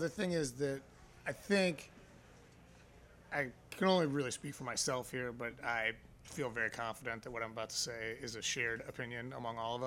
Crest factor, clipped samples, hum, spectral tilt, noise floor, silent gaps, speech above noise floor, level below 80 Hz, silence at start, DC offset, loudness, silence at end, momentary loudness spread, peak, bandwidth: 20 dB; under 0.1%; none; -3.5 dB/octave; -61 dBFS; none; 22 dB; -66 dBFS; 0 s; under 0.1%; -38 LUFS; 0 s; 10 LU; -18 dBFS; 16 kHz